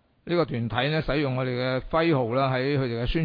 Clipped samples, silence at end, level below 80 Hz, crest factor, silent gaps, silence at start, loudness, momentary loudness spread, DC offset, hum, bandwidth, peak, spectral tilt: under 0.1%; 0 s; -40 dBFS; 16 dB; none; 0.25 s; -25 LUFS; 4 LU; under 0.1%; none; 5.2 kHz; -10 dBFS; -9 dB/octave